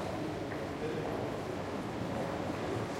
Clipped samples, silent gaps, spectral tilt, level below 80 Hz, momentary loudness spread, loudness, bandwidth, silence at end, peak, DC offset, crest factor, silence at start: under 0.1%; none; -6 dB/octave; -58 dBFS; 2 LU; -37 LUFS; 16.5 kHz; 0 s; -24 dBFS; under 0.1%; 12 dB; 0 s